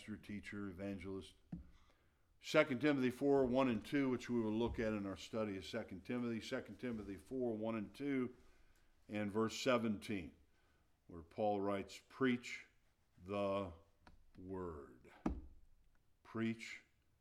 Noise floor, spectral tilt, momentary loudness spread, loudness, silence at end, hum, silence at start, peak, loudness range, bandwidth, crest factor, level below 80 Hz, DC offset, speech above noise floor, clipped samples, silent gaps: -75 dBFS; -6 dB/octave; 17 LU; -41 LUFS; 0.4 s; none; 0 s; -18 dBFS; 10 LU; 14.5 kHz; 24 dB; -64 dBFS; under 0.1%; 35 dB; under 0.1%; none